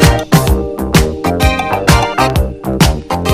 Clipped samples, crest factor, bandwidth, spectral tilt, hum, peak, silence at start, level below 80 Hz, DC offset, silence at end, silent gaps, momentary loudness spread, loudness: 0.7%; 12 dB; 16 kHz; -5 dB/octave; none; 0 dBFS; 0 s; -18 dBFS; under 0.1%; 0 s; none; 5 LU; -12 LUFS